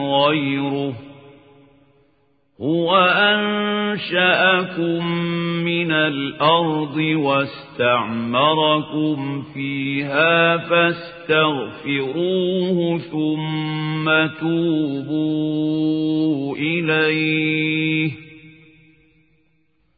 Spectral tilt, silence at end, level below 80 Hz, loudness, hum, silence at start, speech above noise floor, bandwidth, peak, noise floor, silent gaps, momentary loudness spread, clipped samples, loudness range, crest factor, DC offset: -10.5 dB/octave; 1.5 s; -62 dBFS; -19 LUFS; none; 0 s; 45 dB; 5 kHz; -2 dBFS; -65 dBFS; none; 8 LU; under 0.1%; 3 LU; 18 dB; under 0.1%